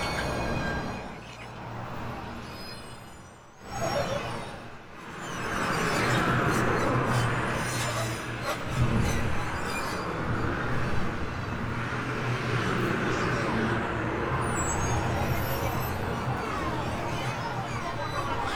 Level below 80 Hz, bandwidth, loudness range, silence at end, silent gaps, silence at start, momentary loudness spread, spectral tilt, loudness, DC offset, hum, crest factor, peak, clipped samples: -42 dBFS; 19 kHz; 8 LU; 0 s; none; 0 s; 14 LU; -5 dB/octave; -29 LUFS; under 0.1%; none; 16 dB; -12 dBFS; under 0.1%